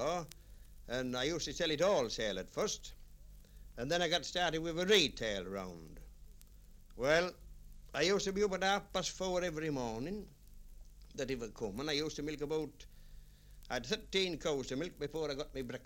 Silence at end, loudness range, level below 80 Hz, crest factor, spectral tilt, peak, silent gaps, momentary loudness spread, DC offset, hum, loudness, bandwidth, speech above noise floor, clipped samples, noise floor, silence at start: 0 s; 6 LU; -54 dBFS; 22 dB; -3.5 dB/octave; -16 dBFS; none; 12 LU; under 0.1%; 50 Hz at -65 dBFS; -36 LUFS; 16.5 kHz; 21 dB; under 0.1%; -57 dBFS; 0 s